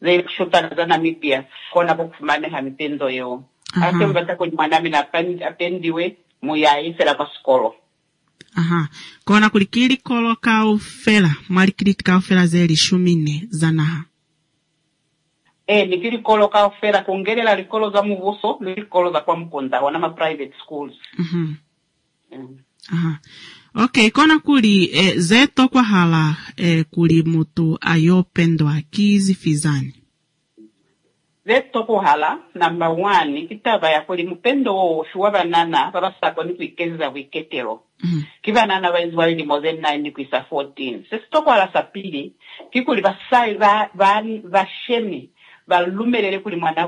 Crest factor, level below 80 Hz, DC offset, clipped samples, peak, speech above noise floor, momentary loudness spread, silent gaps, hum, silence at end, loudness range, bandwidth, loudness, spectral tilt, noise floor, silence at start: 16 dB; -60 dBFS; under 0.1%; under 0.1%; -2 dBFS; 51 dB; 12 LU; none; none; 0 s; 6 LU; 11 kHz; -18 LUFS; -5.5 dB/octave; -68 dBFS; 0 s